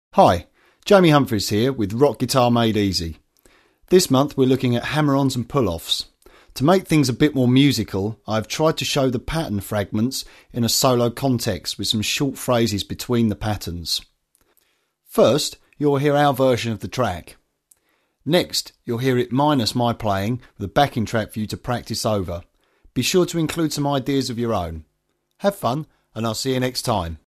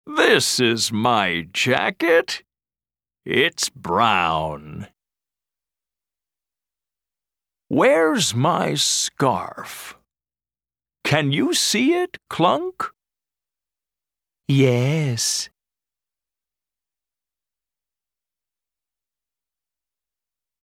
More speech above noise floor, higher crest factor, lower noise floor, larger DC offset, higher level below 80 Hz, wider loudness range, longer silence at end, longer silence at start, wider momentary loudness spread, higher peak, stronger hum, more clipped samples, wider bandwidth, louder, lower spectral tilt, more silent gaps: second, 50 dB vs over 70 dB; about the same, 20 dB vs 22 dB; second, -69 dBFS vs under -90 dBFS; neither; first, -46 dBFS vs -60 dBFS; about the same, 4 LU vs 5 LU; second, 0.2 s vs 5.15 s; about the same, 0.15 s vs 0.05 s; second, 10 LU vs 15 LU; about the same, -2 dBFS vs -2 dBFS; neither; neither; second, 14 kHz vs 16.5 kHz; about the same, -20 LUFS vs -19 LUFS; first, -5 dB/octave vs -3.5 dB/octave; neither